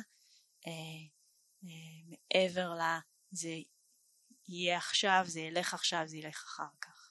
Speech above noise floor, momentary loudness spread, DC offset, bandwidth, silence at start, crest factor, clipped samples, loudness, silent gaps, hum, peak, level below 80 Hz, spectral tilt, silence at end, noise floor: 35 dB; 20 LU; under 0.1%; 12 kHz; 0 s; 24 dB; under 0.1%; -35 LUFS; none; none; -14 dBFS; -88 dBFS; -2.5 dB/octave; 0.05 s; -71 dBFS